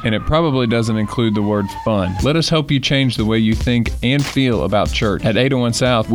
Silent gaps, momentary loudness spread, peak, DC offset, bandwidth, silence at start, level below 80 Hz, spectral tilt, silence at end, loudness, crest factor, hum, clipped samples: none; 3 LU; -4 dBFS; 0.1%; 20 kHz; 0 s; -30 dBFS; -5.5 dB/octave; 0 s; -16 LUFS; 12 dB; none; under 0.1%